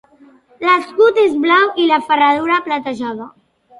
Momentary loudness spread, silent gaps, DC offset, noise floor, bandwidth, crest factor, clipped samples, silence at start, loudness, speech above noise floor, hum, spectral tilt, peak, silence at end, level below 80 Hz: 11 LU; none; under 0.1%; -47 dBFS; 11.5 kHz; 14 dB; under 0.1%; 0.6 s; -14 LUFS; 33 dB; none; -4.5 dB/octave; 0 dBFS; 0.5 s; -62 dBFS